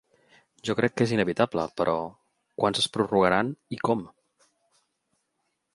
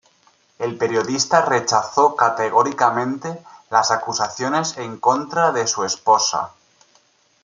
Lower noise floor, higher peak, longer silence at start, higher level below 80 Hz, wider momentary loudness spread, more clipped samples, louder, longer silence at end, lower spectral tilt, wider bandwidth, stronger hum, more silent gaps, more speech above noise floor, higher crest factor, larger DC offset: first, -78 dBFS vs -58 dBFS; second, -6 dBFS vs 0 dBFS; about the same, 0.65 s vs 0.6 s; first, -60 dBFS vs -68 dBFS; about the same, 9 LU vs 10 LU; neither; second, -26 LUFS vs -19 LUFS; first, 1.7 s vs 0.95 s; first, -5 dB/octave vs -2.5 dB/octave; first, 11.5 kHz vs 9.4 kHz; neither; neither; first, 52 dB vs 40 dB; about the same, 22 dB vs 20 dB; neither